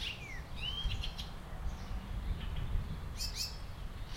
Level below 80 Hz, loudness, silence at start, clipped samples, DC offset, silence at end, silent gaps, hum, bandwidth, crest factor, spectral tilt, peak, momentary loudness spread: -42 dBFS; -41 LUFS; 0 s; under 0.1%; under 0.1%; 0 s; none; none; 16 kHz; 18 dB; -3.5 dB/octave; -22 dBFS; 8 LU